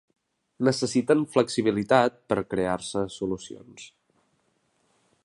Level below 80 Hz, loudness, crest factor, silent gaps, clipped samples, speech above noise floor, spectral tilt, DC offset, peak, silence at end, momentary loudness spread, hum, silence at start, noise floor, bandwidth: -60 dBFS; -25 LUFS; 22 dB; none; under 0.1%; 45 dB; -5 dB/octave; under 0.1%; -4 dBFS; 1.4 s; 18 LU; none; 0.6 s; -70 dBFS; 11.5 kHz